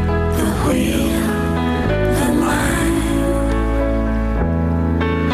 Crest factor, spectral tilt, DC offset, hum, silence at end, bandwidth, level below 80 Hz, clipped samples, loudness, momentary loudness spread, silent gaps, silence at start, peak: 8 dB; -6 dB/octave; under 0.1%; none; 0 s; 15 kHz; -24 dBFS; under 0.1%; -18 LUFS; 2 LU; none; 0 s; -8 dBFS